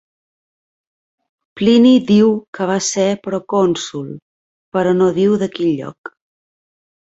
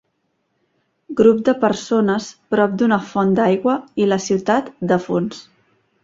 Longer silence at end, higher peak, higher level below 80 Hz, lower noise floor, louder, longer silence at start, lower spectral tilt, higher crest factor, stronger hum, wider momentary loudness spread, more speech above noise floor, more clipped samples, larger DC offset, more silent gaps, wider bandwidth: first, 1.05 s vs 0.65 s; about the same, -2 dBFS vs -2 dBFS; about the same, -58 dBFS vs -58 dBFS; first, under -90 dBFS vs -69 dBFS; first, -15 LUFS vs -18 LUFS; first, 1.55 s vs 1.1 s; about the same, -5.5 dB/octave vs -6 dB/octave; about the same, 14 dB vs 16 dB; neither; first, 17 LU vs 8 LU; first, over 75 dB vs 52 dB; neither; neither; first, 2.48-2.53 s, 4.22-4.72 s, 5.98-6.04 s vs none; about the same, 8 kHz vs 7.8 kHz